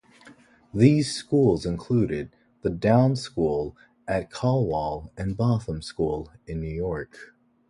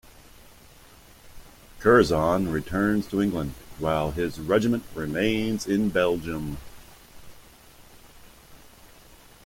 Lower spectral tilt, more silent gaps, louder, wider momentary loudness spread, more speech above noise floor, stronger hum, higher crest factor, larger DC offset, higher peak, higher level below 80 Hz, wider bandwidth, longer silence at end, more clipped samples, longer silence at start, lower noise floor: about the same, -7 dB/octave vs -6 dB/octave; neither; about the same, -25 LUFS vs -25 LUFS; about the same, 14 LU vs 13 LU; about the same, 29 dB vs 27 dB; neither; about the same, 22 dB vs 22 dB; neither; about the same, -4 dBFS vs -4 dBFS; about the same, -46 dBFS vs -48 dBFS; second, 11.5 kHz vs 16.5 kHz; first, 0.45 s vs 0.3 s; neither; second, 0.25 s vs 1.25 s; about the same, -53 dBFS vs -51 dBFS